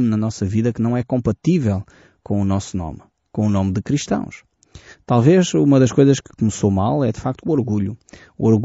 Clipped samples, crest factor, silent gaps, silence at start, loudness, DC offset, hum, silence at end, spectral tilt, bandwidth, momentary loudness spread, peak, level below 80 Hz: under 0.1%; 16 dB; none; 0 s; -19 LUFS; under 0.1%; none; 0 s; -8 dB/octave; 8 kHz; 12 LU; -2 dBFS; -46 dBFS